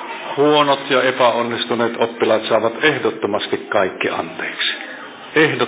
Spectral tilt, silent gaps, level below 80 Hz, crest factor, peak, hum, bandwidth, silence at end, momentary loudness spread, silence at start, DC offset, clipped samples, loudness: -8.5 dB/octave; none; -64 dBFS; 18 dB; 0 dBFS; none; 4 kHz; 0 s; 8 LU; 0 s; under 0.1%; under 0.1%; -17 LUFS